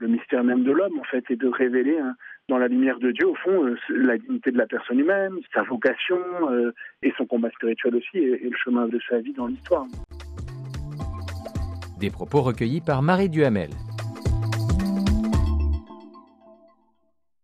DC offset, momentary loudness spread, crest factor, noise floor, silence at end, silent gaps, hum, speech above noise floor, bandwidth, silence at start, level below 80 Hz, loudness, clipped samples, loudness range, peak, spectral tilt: under 0.1%; 12 LU; 18 dB; -74 dBFS; 1.25 s; none; none; 51 dB; 14 kHz; 0 s; -36 dBFS; -24 LUFS; under 0.1%; 5 LU; -6 dBFS; -7.5 dB/octave